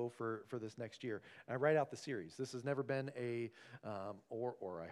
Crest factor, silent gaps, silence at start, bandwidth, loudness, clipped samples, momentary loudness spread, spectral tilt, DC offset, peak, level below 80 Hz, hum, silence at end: 20 dB; none; 0 s; 12.5 kHz; -43 LUFS; under 0.1%; 12 LU; -6.5 dB/octave; under 0.1%; -22 dBFS; -86 dBFS; none; 0 s